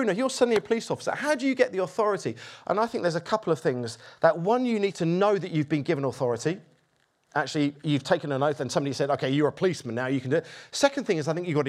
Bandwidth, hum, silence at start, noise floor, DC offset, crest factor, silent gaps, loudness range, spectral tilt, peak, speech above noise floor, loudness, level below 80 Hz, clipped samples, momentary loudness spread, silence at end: 14 kHz; none; 0 s; -69 dBFS; under 0.1%; 20 dB; none; 2 LU; -5.5 dB/octave; -6 dBFS; 43 dB; -26 LUFS; -72 dBFS; under 0.1%; 6 LU; 0 s